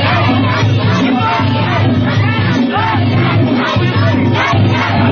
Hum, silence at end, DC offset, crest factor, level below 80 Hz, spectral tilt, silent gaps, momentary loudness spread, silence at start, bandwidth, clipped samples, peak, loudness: none; 0 s; under 0.1%; 10 dB; -32 dBFS; -7 dB/octave; none; 1 LU; 0 s; 6.8 kHz; under 0.1%; 0 dBFS; -12 LUFS